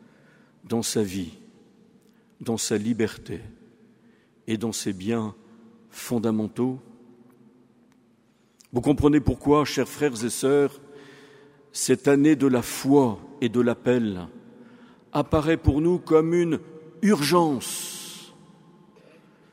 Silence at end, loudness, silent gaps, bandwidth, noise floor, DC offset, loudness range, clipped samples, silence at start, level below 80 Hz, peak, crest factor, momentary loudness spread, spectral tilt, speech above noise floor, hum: 1.25 s; -24 LUFS; none; 16 kHz; -62 dBFS; under 0.1%; 8 LU; under 0.1%; 0.65 s; -46 dBFS; -4 dBFS; 20 dB; 16 LU; -5.5 dB/octave; 39 dB; none